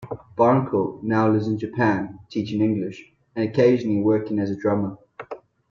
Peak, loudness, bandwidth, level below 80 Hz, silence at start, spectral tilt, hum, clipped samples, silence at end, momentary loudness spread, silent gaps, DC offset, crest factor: -6 dBFS; -22 LUFS; 7 kHz; -60 dBFS; 0 s; -8.5 dB/octave; none; under 0.1%; 0.35 s; 19 LU; none; under 0.1%; 18 dB